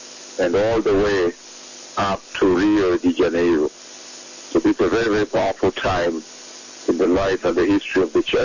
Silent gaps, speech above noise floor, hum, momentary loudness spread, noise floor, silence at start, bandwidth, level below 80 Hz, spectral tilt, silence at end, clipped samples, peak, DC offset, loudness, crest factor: none; 20 dB; 50 Hz at -55 dBFS; 18 LU; -39 dBFS; 0 s; 7.4 kHz; -44 dBFS; -5 dB/octave; 0 s; under 0.1%; -8 dBFS; under 0.1%; -19 LUFS; 12 dB